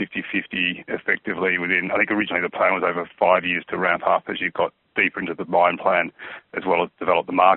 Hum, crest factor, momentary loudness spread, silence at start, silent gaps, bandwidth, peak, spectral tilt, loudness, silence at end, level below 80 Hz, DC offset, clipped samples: none; 20 dB; 7 LU; 0 s; none; 4.2 kHz; -2 dBFS; -2 dB/octave; -21 LUFS; 0 s; -64 dBFS; under 0.1%; under 0.1%